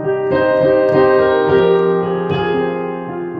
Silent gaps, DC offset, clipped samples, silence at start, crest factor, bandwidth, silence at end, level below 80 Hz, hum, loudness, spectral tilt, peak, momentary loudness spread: none; under 0.1%; under 0.1%; 0 s; 12 dB; 5.2 kHz; 0 s; -46 dBFS; none; -14 LUFS; -9 dB/octave; -2 dBFS; 8 LU